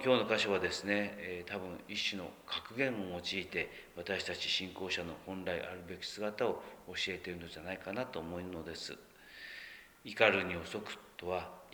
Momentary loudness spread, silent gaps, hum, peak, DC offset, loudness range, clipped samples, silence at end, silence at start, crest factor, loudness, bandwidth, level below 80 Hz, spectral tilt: 15 LU; none; none; -12 dBFS; under 0.1%; 4 LU; under 0.1%; 0 s; 0 s; 26 dB; -37 LUFS; over 20 kHz; -68 dBFS; -4 dB/octave